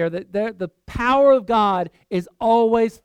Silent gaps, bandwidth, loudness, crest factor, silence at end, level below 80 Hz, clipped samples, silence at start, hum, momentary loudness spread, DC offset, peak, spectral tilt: none; 10.5 kHz; -19 LUFS; 14 dB; 0.15 s; -44 dBFS; under 0.1%; 0 s; none; 12 LU; under 0.1%; -6 dBFS; -6.5 dB/octave